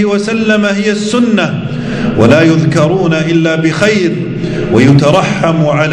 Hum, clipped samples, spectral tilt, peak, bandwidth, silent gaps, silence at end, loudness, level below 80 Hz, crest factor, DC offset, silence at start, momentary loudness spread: none; 1%; -6.5 dB/octave; 0 dBFS; 10.5 kHz; none; 0 s; -10 LUFS; -38 dBFS; 10 dB; under 0.1%; 0 s; 8 LU